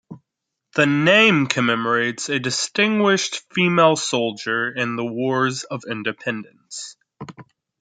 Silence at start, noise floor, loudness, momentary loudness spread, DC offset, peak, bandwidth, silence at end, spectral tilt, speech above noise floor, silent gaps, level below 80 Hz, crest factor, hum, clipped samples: 0.1 s; -81 dBFS; -19 LUFS; 18 LU; under 0.1%; 0 dBFS; 9.6 kHz; 0.4 s; -4 dB/octave; 61 dB; none; -68 dBFS; 20 dB; none; under 0.1%